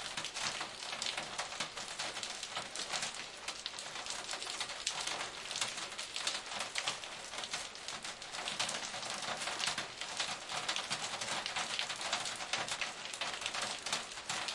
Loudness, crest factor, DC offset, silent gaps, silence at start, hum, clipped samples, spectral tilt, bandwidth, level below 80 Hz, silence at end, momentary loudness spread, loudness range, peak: -38 LUFS; 26 dB; under 0.1%; none; 0 s; none; under 0.1%; 0 dB/octave; 11.5 kHz; -72 dBFS; 0 s; 5 LU; 2 LU; -16 dBFS